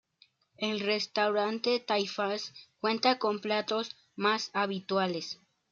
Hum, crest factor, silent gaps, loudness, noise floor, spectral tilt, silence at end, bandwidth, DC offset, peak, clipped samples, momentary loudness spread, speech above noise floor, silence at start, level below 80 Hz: none; 18 dB; none; -31 LUFS; -67 dBFS; -4 dB/octave; 0.35 s; 7.6 kHz; under 0.1%; -14 dBFS; under 0.1%; 9 LU; 36 dB; 0.6 s; -80 dBFS